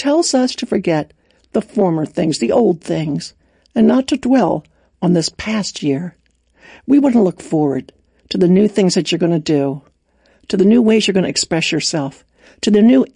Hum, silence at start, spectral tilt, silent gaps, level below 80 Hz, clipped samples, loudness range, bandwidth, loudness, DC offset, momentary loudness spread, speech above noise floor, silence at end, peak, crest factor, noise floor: none; 0 s; -5.5 dB/octave; none; -52 dBFS; under 0.1%; 3 LU; 10.5 kHz; -16 LUFS; under 0.1%; 11 LU; 42 dB; 0.1 s; -2 dBFS; 14 dB; -56 dBFS